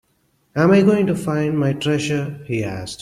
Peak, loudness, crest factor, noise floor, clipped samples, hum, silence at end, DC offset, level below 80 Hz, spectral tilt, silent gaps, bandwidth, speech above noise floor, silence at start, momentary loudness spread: -4 dBFS; -19 LUFS; 16 dB; -64 dBFS; under 0.1%; none; 0.05 s; under 0.1%; -54 dBFS; -6.5 dB/octave; none; 14.5 kHz; 46 dB; 0.55 s; 11 LU